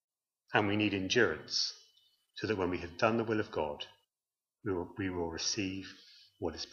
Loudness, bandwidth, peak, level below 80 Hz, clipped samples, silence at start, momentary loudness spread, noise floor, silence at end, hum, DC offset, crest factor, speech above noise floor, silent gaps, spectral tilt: -34 LUFS; 7.4 kHz; -12 dBFS; -64 dBFS; under 0.1%; 0.5 s; 15 LU; under -90 dBFS; 0 s; none; under 0.1%; 22 dB; over 56 dB; none; -4 dB/octave